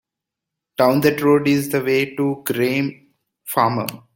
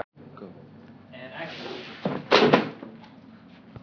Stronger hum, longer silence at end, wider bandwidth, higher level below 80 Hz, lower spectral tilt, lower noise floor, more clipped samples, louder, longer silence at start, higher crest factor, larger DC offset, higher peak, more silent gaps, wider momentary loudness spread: neither; first, 0.2 s vs 0.05 s; first, 17 kHz vs 5.4 kHz; first, -60 dBFS vs -68 dBFS; about the same, -5.5 dB/octave vs -5.5 dB/octave; first, -84 dBFS vs -49 dBFS; neither; first, -19 LUFS vs -24 LUFS; first, 0.8 s vs 0.2 s; second, 18 dB vs 28 dB; neither; about the same, -2 dBFS vs -2 dBFS; neither; second, 10 LU vs 26 LU